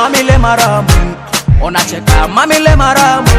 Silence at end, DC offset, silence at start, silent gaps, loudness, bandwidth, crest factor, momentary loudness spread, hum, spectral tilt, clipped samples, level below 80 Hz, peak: 0 s; under 0.1%; 0 s; none; -9 LUFS; over 20 kHz; 8 dB; 5 LU; none; -4.5 dB/octave; 3%; -14 dBFS; 0 dBFS